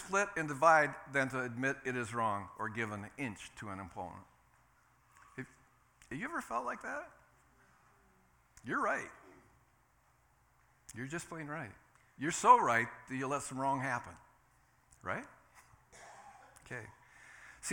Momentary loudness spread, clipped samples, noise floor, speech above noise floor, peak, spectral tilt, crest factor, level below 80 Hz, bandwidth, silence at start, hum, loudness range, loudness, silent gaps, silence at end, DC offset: 27 LU; under 0.1%; -71 dBFS; 35 dB; -12 dBFS; -4.5 dB/octave; 26 dB; -72 dBFS; 18 kHz; 0 s; none; 14 LU; -35 LUFS; none; 0 s; under 0.1%